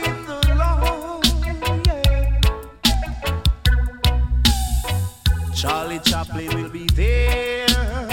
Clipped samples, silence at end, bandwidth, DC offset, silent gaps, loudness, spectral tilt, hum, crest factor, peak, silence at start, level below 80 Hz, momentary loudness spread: under 0.1%; 0 s; 17 kHz; under 0.1%; none; -20 LUFS; -4.5 dB/octave; none; 16 dB; -2 dBFS; 0 s; -22 dBFS; 6 LU